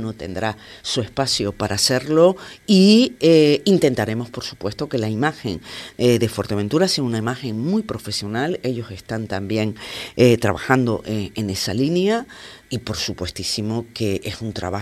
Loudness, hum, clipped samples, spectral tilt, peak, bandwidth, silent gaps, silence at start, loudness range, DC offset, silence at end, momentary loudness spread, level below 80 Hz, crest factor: -20 LUFS; none; under 0.1%; -5 dB/octave; 0 dBFS; 14.5 kHz; none; 0 s; 7 LU; under 0.1%; 0 s; 14 LU; -50 dBFS; 20 dB